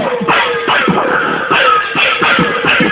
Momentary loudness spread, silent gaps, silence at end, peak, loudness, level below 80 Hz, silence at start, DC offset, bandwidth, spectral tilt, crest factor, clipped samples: 3 LU; none; 0 s; 0 dBFS; -11 LUFS; -46 dBFS; 0 s; under 0.1%; 4 kHz; -8 dB/octave; 12 dB; under 0.1%